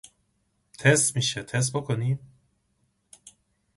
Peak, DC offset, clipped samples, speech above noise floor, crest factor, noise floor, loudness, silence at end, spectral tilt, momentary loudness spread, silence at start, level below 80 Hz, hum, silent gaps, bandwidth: -6 dBFS; under 0.1%; under 0.1%; 47 dB; 22 dB; -72 dBFS; -25 LUFS; 1.6 s; -3.5 dB/octave; 9 LU; 0.8 s; -62 dBFS; none; none; 11.5 kHz